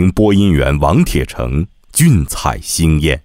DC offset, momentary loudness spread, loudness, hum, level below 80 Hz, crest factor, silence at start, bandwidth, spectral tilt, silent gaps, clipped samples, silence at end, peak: under 0.1%; 7 LU; -13 LUFS; none; -22 dBFS; 12 dB; 0 s; 16.5 kHz; -5.5 dB/octave; none; under 0.1%; 0.05 s; 0 dBFS